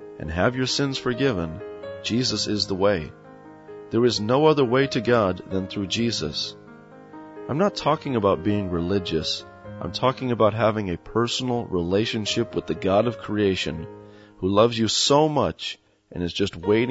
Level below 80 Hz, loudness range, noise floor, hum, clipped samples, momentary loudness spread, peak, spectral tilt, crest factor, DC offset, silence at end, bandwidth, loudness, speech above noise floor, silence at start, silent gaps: -50 dBFS; 3 LU; -45 dBFS; none; under 0.1%; 13 LU; -4 dBFS; -5 dB/octave; 20 dB; under 0.1%; 0 s; 8 kHz; -23 LUFS; 23 dB; 0 s; none